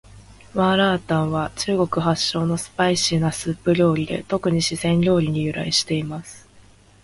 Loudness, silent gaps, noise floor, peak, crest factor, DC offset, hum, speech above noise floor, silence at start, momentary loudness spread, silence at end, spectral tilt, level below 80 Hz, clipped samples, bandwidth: -21 LUFS; none; -50 dBFS; -4 dBFS; 16 dB; under 0.1%; none; 30 dB; 0.15 s; 6 LU; 0.45 s; -5 dB/octave; -50 dBFS; under 0.1%; 11.5 kHz